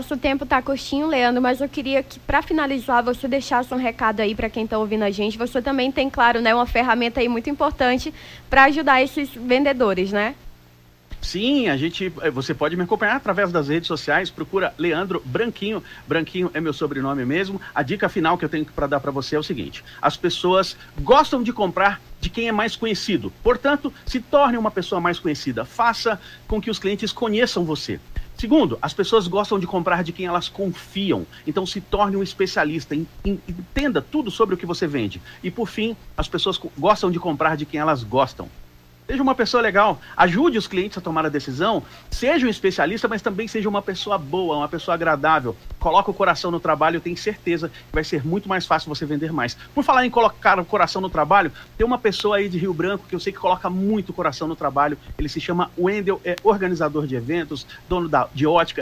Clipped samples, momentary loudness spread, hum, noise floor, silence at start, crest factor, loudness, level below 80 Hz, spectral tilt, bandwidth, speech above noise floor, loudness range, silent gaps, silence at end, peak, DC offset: under 0.1%; 9 LU; none; -51 dBFS; 0 s; 18 dB; -21 LUFS; -42 dBFS; -5.5 dB/octave; 16 kHz; 30 dB; 4 LU; none; 0 s; -2 dBFS; under 0.1%